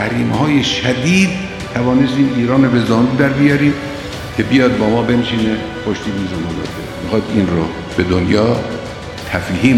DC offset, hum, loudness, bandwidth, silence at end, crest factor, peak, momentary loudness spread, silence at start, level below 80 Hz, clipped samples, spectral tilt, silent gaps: under 0.1%; none; -15 LUFS; 13.5 kHz; 0 s; 14 dB; 0 dBFS; 10 LU; 0 s; -38 dBFS; under 0.1%; -6 dB/octave; none